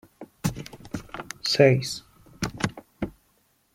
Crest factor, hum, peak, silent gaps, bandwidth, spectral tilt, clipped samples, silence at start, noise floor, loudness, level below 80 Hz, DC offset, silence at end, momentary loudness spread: 24 dB; none; -4 dBFS; none; 16.5 kHz; -5 dB/octave; under 0.1%; 0.2 s; -66 dBFS; -26 LUFS; -52 dBFS; under 0.1%; 0.65 s; 19 LU